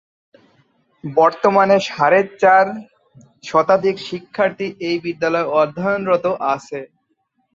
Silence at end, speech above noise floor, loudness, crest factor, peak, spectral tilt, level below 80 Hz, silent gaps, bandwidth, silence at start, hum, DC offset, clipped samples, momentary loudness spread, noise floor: 0.7 s; 50 dB; -17 LUFS; 16 dB; -2 dBFS; -5.5 dB/octave; -62 dBFS; none; 7.6 kHz; 1.05 s; none; under 0.1%; under 0.1%; 14 LU; -67 dBFS